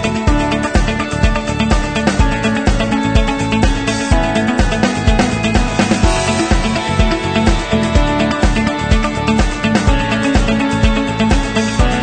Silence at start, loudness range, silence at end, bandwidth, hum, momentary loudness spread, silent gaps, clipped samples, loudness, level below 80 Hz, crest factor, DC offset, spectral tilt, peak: 0 s; 1 LU; 0 s; 9.4 kHz; none; 2 LU; none; under 0.1%; -15 LUFS; -18 dBFS; 14 dB; under 0.1%; -5.5 dB/octave; 0 dBFS